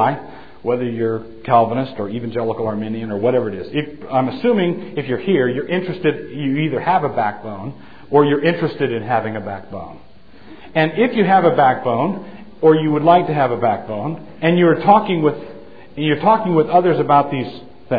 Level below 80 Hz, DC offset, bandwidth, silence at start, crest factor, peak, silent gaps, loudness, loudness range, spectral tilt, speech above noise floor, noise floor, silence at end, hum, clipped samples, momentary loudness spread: -54 dBFS; 1%; 5 kHz; 0 s; 18 dB; 0 dBFS; none; -17 LUFS; 5 LU; -10 dB/octave; 26 dB; -43 dBFS; 0 s; none; under 0.1%; 15 LU